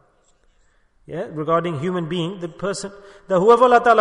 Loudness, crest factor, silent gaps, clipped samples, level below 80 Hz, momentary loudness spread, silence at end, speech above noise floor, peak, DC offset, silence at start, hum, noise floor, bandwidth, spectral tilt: -19 LUFS; 18 dB; none; under 0.1%; -56 dBFS; 17 LU; 0 s; 40 dB; -2 dBFS; under 0.1%; 1.1 s; none; -59 dBFS; 10.5 kHz; -6 dB/octave